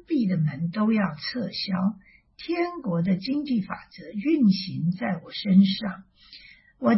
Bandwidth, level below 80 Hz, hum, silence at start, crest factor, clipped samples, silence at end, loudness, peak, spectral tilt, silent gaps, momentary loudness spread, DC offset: 5.8 kHz; -62 dBFS; none; 0.1 s; 18 dB; under 0.1%; 0 s; -25 LUFS; -8 dBFS; -10 dB/octave; none; 15 LU; under 0.1%